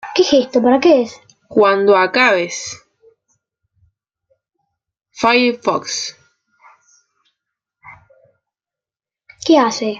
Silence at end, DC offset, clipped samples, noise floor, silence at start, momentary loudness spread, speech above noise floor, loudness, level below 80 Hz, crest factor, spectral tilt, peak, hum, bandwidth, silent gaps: 0 s; under 0.1%; under 0.1%; -90 dBFS; 0.05 s; 14 LU; 76 dB; -14 LUFS; -62 dBFS; 16 dB; -3 dB/octave; -2 dBFS; none; 8.8 kHz; none